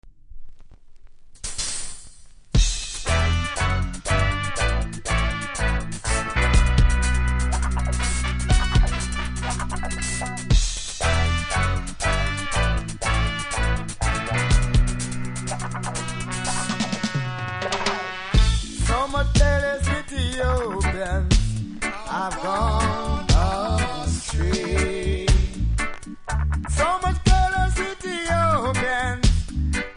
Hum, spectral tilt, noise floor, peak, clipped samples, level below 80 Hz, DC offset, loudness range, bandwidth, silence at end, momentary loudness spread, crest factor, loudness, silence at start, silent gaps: none; -4.5 dB/octave; -43 dBFS; -2 dBFS; under 0.1%; -24 dBFS; under 0.1%; 3 LU; 10.5 kHz; 0 s; 8 LU; 20 dB; -23 LUFS; 0.05 s; none